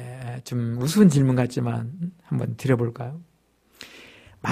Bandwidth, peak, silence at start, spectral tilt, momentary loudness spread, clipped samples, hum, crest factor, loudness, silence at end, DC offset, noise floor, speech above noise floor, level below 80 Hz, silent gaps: 15.5 kHz; -4 dBFS; 0 s; -7 dB/octave; 25 LU; under 0.1%; none; 20 dB; -23 LUFS; 0 s; under 0.1%; -62 dBFS; 40 dB; -56 dBFS; none